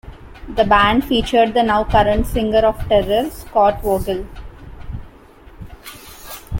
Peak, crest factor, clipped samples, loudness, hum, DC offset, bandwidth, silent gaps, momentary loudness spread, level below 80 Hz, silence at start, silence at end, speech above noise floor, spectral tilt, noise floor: -2 dBFS; 16 dB; under 0.1%; -16 LUFS; none; under 0.1%; 17 kHz; none; 21 LU; -32 dBFS; 0.05 s; 0 s; 27 dB; -5.5 dB/octave; -43 dBFS